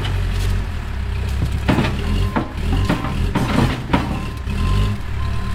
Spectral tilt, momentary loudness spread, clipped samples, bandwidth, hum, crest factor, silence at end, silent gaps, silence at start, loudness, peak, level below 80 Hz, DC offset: -6.5 dB/octave; 6 LU; under 0.1%; 15.5 kHz; none; 16 dB; 0 s; none; 0 s; -21 LUFS; -2 dBFS; -24 dBFS; under 0.1%